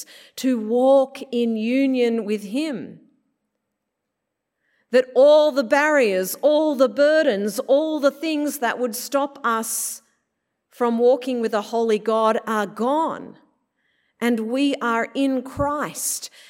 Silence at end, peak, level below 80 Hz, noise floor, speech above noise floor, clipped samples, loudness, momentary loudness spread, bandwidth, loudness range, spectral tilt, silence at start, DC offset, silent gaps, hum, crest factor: 0.2 s; -4 dBFS; -58 dBFS; -80 dBFS; 59 dB; under 0.1%; -20 LUFS; 9 LU; 16.5 kHz; 6 LU; -3.5 dB/octave; 0 s; under 0.1%; none; none; 16 dB